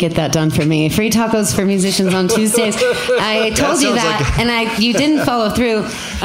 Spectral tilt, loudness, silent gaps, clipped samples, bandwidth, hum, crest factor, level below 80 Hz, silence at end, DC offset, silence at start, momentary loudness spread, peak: -4 dB/octave; -14 LUFS; none; under 0.1%; 16.5 kHz; none; 12 dB; -34 dBFS; 0 s; 0.1%; 0 s; 2 LU; -2 dBFS